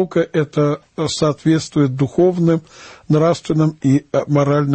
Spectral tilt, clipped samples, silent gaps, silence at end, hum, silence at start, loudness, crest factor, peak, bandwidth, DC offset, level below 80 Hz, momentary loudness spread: -7 dB/octave; under 0.1%; none; 0 s; none; 0 s; -17 LUFS; 14 dB; -2 dBFS; 8.8 kHz; under 0.1%; -50 dBFS; 4 LU